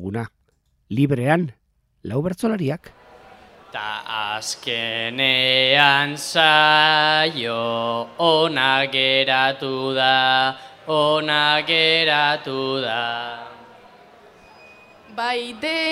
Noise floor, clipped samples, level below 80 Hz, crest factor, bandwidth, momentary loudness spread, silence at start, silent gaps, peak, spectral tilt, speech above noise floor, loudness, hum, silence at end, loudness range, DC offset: -65 dBFS; under 0.1%; -62 dBFS; 20 dB; 16 kHz; 15 LU; 0 s; none; 0 dBFS; -4 dB/octave; 45 dB; -18 LUFS; none; 0 s; 10 LU; under 0.1%